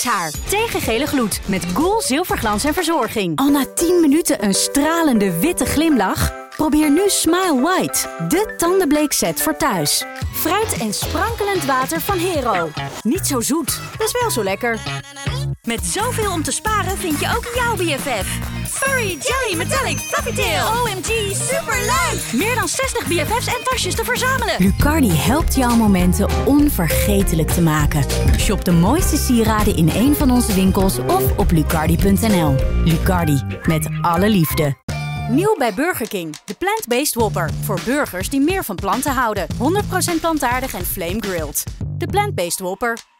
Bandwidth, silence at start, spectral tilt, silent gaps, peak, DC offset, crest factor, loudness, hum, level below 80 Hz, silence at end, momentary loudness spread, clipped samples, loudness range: over 20 kHz; 0 s; -4.5 dB/octave; 34.83-34.88 s; -6 dBFS; under 0.1%; 12 dB; -18 LUFS; none; -28 dBFS; 0.2 s; 6 LU; under 0.1%; 4 LU